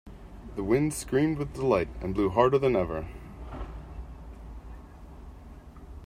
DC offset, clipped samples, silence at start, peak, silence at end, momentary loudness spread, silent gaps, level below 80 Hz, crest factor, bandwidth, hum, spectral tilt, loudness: under 0.1%; under 0.1%; 0.05 s; -8 dBFS; 0 s; 24 LU; none; -44 dBFS; 22 dB; 15.5 kHz; none; -6.5 dB/octave; -27 LUFS